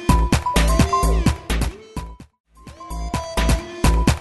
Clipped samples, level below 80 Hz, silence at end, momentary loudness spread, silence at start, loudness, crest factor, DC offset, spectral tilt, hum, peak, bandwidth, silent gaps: under 0.1%; -22 dBFS; 0 s; 17 LU; 0 s; -20 LUFS; 18 dB; under 0.1%; -5 dB/octave; none; -2 dBFS; 12.5 kHz; 2.40-2.44 s